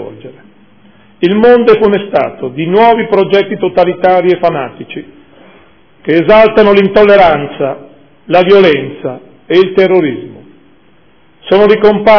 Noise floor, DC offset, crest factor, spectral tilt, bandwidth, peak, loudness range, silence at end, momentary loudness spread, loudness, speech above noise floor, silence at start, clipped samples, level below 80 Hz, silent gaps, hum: -47 dBFS; under 0.1%; 10 dB; -8 dB/octave; 5.4 kHz; 0 dBFS; 4 LU; 0 s; 16 LU; -8 LUFS; 40 dB; 0 s; 4%; -42 dBFS; none; none